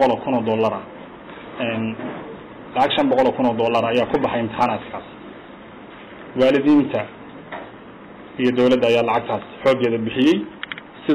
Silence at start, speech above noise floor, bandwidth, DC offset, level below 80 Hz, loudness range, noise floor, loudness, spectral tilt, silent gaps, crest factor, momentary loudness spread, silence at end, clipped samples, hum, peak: 0 s; 21 dB; 10 kHz; under 0.1%; -54 dBFS; 3 LU; -40 dBFS; -19 LUFS; -6.5 dB/octave; none; 12 dB; 22 LU; 0 s; under 0.1%; none; -8 dBFS